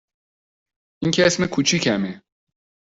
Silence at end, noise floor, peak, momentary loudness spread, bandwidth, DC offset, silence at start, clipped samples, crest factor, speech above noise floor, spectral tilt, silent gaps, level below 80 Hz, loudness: 0.7 s; under -90 dBFS; -2 dBFS; 9 LU; 8 kHz; under 0.1%; 1 s; under 0.1%; 22 dB; over 70 dB; -4 dB/octave; none; -56 dBFS; -20 LUFS